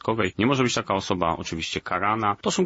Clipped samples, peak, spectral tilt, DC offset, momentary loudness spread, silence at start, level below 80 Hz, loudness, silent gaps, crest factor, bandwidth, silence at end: under 0.1%; -6 dBFS; -4.5 dB/octave; under 0.1%; 6 LU; 0.05 s; -54 dBFS; -24 LUFS; none; 18 dB; 8 kHz; 0 s